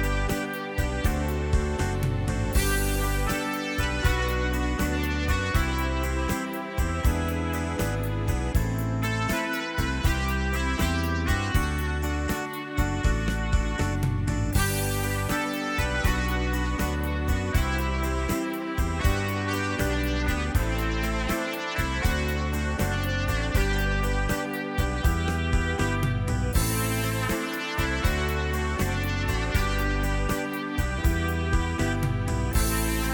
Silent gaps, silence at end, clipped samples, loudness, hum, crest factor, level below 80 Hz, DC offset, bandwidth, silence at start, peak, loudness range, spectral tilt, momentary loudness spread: none; 0 s; under 0.1%; -27 LUFS; none; 18 dB; -30 dBFS; under 0.1%; over 20 kHz; 0 s; -8 dBFS; 1 LU; -5 dB/octave; 3 LU